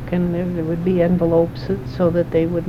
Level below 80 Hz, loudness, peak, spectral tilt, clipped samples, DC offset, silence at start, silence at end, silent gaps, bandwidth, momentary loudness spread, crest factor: -38 dBFS; -19 LUFS; -4 dBFS; -9.5 dB/octave; under 0.1%; under 0.1%; 0 s; 0 s; none; 6 kHz; 6 LU; 14 dB